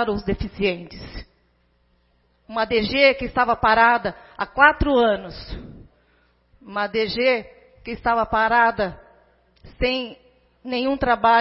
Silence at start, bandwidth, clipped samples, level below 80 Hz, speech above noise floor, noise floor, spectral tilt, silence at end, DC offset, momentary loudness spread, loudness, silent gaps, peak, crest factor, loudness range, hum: 0 s; 5.8 kHz; under 0.1%; -40 dBFS; 43 dB; -63 dBFS; -9 dB/octave; 0 s; under 0.1%; 20 LU; -20 LUFS; none; 0 dBFS; 22 dB; 6 LU; 60 Hz at -55 dBFS